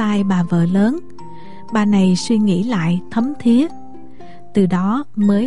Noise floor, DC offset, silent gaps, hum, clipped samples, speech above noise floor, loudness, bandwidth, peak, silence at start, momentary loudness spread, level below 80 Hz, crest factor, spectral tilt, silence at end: -40 dBFS; 3%; none; none; under 0.1%; 25 dB; -17 LUFS; 11 kHz; -4 dBFS; 0 s; 7 LU; -52 dBFS; 12 dB; -7 dB/octave; 0 s